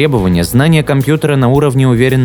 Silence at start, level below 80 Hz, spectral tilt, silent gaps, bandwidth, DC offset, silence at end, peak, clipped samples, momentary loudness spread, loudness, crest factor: 0 s; -32 dBFS; -7 dB/octave; none; over 20 kHz; under 0.1%; 0 s; 0 dBFS; under 0.1%; 2 LU; -11 LUFS; 10 dB